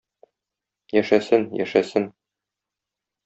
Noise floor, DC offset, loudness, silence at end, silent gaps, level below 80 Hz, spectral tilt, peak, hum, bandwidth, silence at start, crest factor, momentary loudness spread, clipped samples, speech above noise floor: -86 dBFS; under 0.1%; -22 LUFS; 1.15 s; none; -66 dBFS; -6 dB/octave; -4 dBFS; none; 8 kHz; 0.95 s; 22 dB; 7 LU; under 0.1%; 66 dB